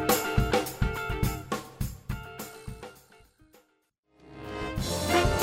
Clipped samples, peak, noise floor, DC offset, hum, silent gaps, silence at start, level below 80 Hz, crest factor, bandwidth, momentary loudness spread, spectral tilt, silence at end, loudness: under 0.1%; -10 dBFS; -72 dBFS; under 0.1%; none; 3.98-4.03 s; 0 s; -38 dBFS; 20 dB; 16 kHz; 18 LU; -4.5 dB/octave; 0 s; -30 LUFS